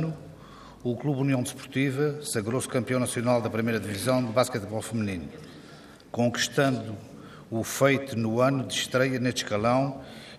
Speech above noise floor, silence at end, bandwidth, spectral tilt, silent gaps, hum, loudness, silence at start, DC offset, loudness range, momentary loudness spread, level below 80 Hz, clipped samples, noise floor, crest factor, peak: 22 dB; 0 s; 15.5 kHz; -5 dB/octave; none; none; -27 LUFS; 0 s; under 0.1%; 3 LU; 17 LU; -62 dBFS; under 0.1%; -48 dBFS; 20 dB; -8 dBFS